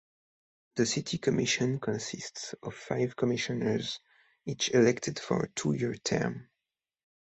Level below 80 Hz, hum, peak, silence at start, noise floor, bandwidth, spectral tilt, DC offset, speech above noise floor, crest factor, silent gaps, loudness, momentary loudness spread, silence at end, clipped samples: -64 dBFS; none; -12 dBFS; 0.75 s; -89 dBFS; 8.4 kHz; -4.5 dB/octave; under 0.1%; 59 dB; 20 dB; none; -31 LUFS; 13 LU; 0.8 s; under 0.1%